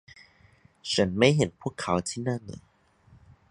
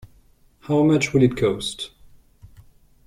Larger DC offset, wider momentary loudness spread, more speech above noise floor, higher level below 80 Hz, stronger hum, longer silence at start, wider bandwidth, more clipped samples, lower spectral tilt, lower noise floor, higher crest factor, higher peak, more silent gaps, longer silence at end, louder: neither; first, 19 LU vs 14 LU; about the same, 33 dB vs 36 dB; about the same, -54 dBFS vs -50 dBFS; neither; first, 0.85 s vs 0.7 s; second, 11.5 kHz vs 14.5 kHz; neither; about the same, -5 dB/octave vs -6 dB/octave; first, -60 dBFS vs -55 dBFS; about the same, 24 dB vs 20 dB; about the same, -6 dBFS vs -4 dBFS; neither; second, 0.9 s vs 1.2 s; second, -26 LUFS vs -20 LUFS